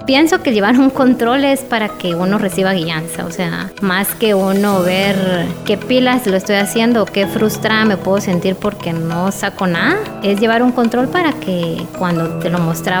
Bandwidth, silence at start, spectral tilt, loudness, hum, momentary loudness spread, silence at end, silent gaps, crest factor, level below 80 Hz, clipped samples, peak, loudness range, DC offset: over 20 kHz; 0 s; -5 dB/octave; -15 LUFS; none; 7 LU; 0 s; none; 14 dB; -46 dBFS; under 0.1%; 0 dBFS; 2 LU; under 0.1%